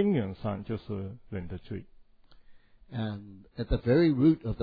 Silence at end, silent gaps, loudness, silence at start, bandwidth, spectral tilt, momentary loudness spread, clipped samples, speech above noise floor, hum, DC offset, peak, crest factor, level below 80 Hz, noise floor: 0 s; none; -30 LUFS; 0 s; 5 kHz; -11 dB/octave; 18 LU; under 0.1%; 26 dB; none; under 0.1%; -12 dBFS; 18 dB; -44 dBFS; -55 dBFS